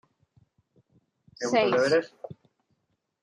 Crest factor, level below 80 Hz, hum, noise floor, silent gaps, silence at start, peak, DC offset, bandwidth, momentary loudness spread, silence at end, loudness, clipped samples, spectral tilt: 20 dB; -74 dBFS; none; -76 dBFS; none; 1.4 s; -10 dBFS; under 0.1%; 11 kHz; 22 LU; 0.9 s; -25 LUFS; under 0.1%; -4.5 dB/octave